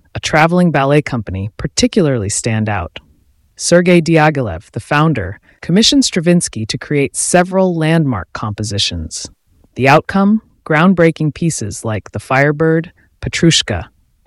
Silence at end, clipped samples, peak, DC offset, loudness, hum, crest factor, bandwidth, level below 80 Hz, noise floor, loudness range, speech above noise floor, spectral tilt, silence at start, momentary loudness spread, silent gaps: 0.4 s; under 0.1%; 0 dBFS; under 0.1%; -14 LUFS; none; 14 dB; 12 kHz; -40 dBFS; -52 dBFS; 2 LU; 39 dB; -4.5 dB/octave; 0.15 s; 13 LU; none